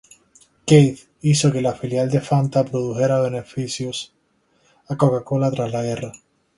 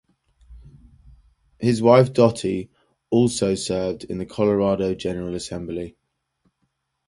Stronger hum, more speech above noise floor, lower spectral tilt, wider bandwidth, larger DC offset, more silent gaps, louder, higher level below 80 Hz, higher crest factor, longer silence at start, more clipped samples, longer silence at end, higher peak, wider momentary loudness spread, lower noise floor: neither; second, 44 dB vs 53 dB; about the same, -6 dB/octave vs -6 dB/octave; about the same, 11.5 kHz vs 11.5 kHz; neither; neither; about the same, -20 LUFS vs -21 LUFS; second, -56 dBFS vs -50 dBFS; about the same, 20 dB vs 22 dB; first, 0.65 s vs 0.5 s; neither; second, 0.4 s vs 1.15 s; about the same, 0 dBFS vs 0 dBFS; about the same, 14 LU vs 15 LU; second, -63 dBFS vs -73 dBFS